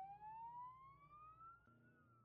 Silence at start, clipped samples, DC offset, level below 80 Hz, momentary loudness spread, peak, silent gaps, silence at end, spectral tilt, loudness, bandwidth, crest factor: 0 s; under 0.1%; under 0.1%; -82 dBFS; 9 LU; -48 dBFS; none; 0 s; -5 dB/octave; -59 LUFS; 4.6 kHz; 12 dB